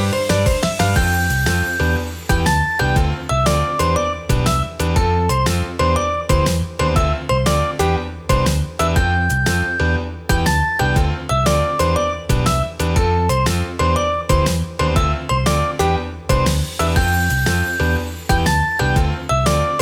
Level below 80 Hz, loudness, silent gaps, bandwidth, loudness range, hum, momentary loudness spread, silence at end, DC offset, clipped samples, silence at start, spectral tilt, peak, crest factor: -24 dBFS; -18 LUFS; none; 19 kHz; 1 LU; none; 3 LU; 0 s; under 0.1%; under 0.1%; 0 s; -5 dB/octave; -2 dBFS; 14 dB